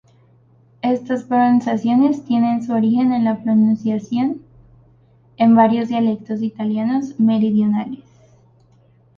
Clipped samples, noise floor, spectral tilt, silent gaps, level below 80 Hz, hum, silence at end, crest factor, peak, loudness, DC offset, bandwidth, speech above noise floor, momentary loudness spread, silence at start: under 0.1%; -53 dBFS; -8 dB/octave; none; -60 dBFS; none; 1.25 s; 16 dB; -2 dBFS; -17 LUFS; under 0.1%; 6.8 kHz; 37 dB; 9 LU; 0.85 s